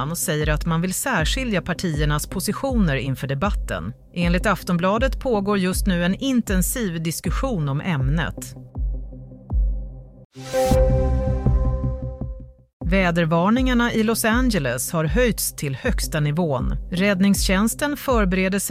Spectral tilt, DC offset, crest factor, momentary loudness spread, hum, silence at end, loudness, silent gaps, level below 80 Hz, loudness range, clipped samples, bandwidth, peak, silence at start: -5 dB/octave; under 0.1%; 16 dB; 11 LU; none; 0 s; -22 LUFS; 10.25-10.30 s, 12.73-12.80 s; -28 dBFS; 4 LU; under 0.1%; 16 kHz; -6 dBFS; 0 s